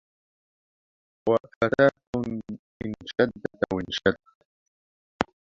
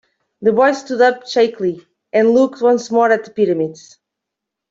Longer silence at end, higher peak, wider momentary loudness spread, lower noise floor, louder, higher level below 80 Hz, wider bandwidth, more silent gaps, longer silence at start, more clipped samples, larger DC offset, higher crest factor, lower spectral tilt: second, 0.35 s vs 0.95 s; about the same, -2 dBFS vs -2 dBFS; first, 14 LU vs 8 LU; first, under -90 dBFS vs -81 dBFS; second, -27 LUFS vs -16 LUFS; first, -54 dBFS vs -64 dBFS; about the same, 7.6 kHz vs 7.8 kHz; first, 1.56-1.61 s, 2.07-2.13 s, 2.59-2.80 s, 4.35-5.19 s vs none; first, 1.25 s vs 0.4 s; neither; neither; first, 26 dB vs 14 dB; about the same, -6 dB/octave vs -5 dB/octave